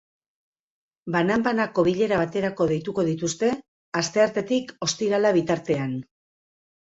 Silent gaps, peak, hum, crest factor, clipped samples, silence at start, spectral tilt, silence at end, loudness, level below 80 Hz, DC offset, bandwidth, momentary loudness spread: 3.68-3.92 s; -6 dBFS; none; 18 dB; under 0.1%; 1.05 s; -5 dB/octave; 0.8 s; -24 LUFS; -60 dBFS; under 0.1%; 8 kHz; 6 LU